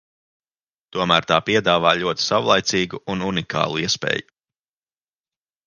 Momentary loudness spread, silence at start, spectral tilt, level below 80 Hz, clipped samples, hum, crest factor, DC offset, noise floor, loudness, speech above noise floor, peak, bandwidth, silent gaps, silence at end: 8 LU; 0.95 s; -3.5 dB/octave; -54 dBFS; under 0.1%; none; 22 dB; under 0.1%; under -90 dBFS; -19 LUFS; over 70 dB; 0 dBFS; 10.5 kHz; none; 1.45 s